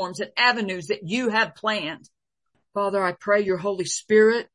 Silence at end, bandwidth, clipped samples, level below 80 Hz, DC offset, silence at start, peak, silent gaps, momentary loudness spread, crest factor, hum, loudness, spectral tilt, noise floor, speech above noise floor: 0.1 s; 11.5 kHz; under 0.1%; -70 dBFS; under 0.1%; 0 s; -4 dBFS; none; 10 LU; 18 dB; none; -23 LUFS; -3.5 dB/octave; -75 dBFS; 52 dB